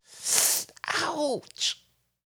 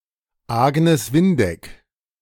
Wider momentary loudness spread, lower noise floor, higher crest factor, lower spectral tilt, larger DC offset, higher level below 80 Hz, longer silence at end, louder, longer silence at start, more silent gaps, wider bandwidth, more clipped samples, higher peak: about the same, 9 LU vs 9 LU; first, -62 dBFS vs -48 dBFS; first, 28 dB vs 16 dB; second, 0 dB/octave vs -6.5 dB/octave; neither; second, -76 dBFS vs -48 dBFS; about the same, 0.6 s vs 0.5 s; second, -26 LUFS vs -18 LUFS; second, 0.1 s vs 0.5 s; neither; first, over 20 kHz vs 18 kHz; neither; about the same, -2 dBFS vs -4 dBFS